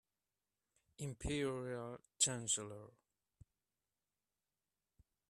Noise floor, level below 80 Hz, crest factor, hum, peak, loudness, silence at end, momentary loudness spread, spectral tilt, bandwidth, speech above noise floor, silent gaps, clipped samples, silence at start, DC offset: under -90 dBFS; -64 dBFS; 28 dB; 50 Hz at -80 dBFS; -18 dBFS; -40 LUFS; 2.4 s; 16 LU; -3 dB/octave; 13.5 kHz; over 48 dB; none; under 0.1%; 1 s; under 0.1%